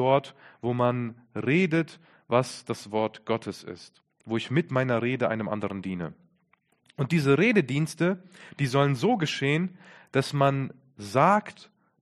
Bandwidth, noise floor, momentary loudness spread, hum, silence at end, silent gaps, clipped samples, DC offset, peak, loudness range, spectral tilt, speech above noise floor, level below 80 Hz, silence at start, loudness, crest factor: 13 kHz; -69 dBFS; 15 LU; none; 0.5 s; none; under 0.1%; under 0.1%; -6 dBFS; 5 LU; -6.5 dB/octave; 42 dB; -66 dBFS; 0 s; -27 LUFS; 20 dB